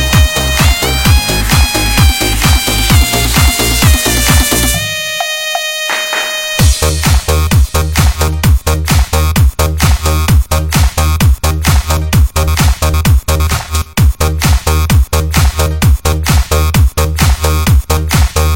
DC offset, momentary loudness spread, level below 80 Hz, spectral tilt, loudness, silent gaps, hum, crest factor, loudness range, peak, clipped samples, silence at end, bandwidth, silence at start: 0.2%; 4 LU; -14 dBFS; -4 dB/octave; -11 LUFS; none; none; 10 dB; 2 LU; 0 dBFS; 0.2%; 0 s; 17 kHz; 0 s